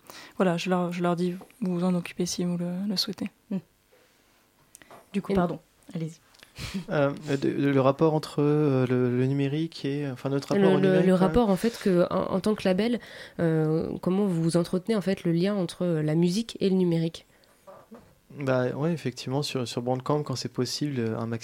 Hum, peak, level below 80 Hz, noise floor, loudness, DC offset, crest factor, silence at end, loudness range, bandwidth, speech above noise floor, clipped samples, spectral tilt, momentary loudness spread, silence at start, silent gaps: none; -8 dBFS; -56 dBFS; -63 dBFS; -26 LUFS; under 0.1%; 20 dB; 0 s; 8 LU; 16 kHz; 37 dB; under 0.1%; -6.5 dB/octave; 11 LU; 0.1 s; none